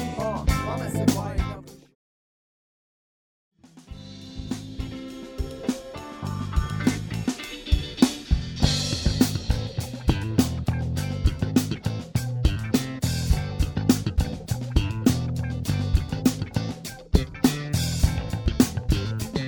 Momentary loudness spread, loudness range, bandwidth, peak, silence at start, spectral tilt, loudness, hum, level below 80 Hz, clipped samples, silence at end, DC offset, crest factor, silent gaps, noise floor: 12 LU; 11 LU; 19.5 kHz; -2 dBFS; 0 s; -5.5 dB/octave; -26 LUFS; none; -32 dBFS; under 0.1%; 0 s; under 0.1%; 24 dB; 1.95-3.51 s; under -90 dBFS